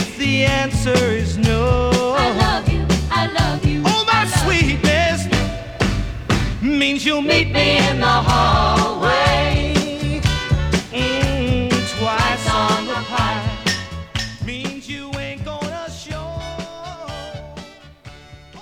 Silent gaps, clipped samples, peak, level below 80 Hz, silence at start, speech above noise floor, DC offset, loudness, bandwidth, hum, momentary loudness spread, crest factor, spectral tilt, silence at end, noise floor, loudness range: none; under 0.1%; 0 dBFS; -28 dBFS; 0 s; 25 dB; under 0.1%; -18 LUFS; 17 kHz; none; 14 LU; 18 dB; -5 dB/octave; 0 s; -40 dBFS; 12 LU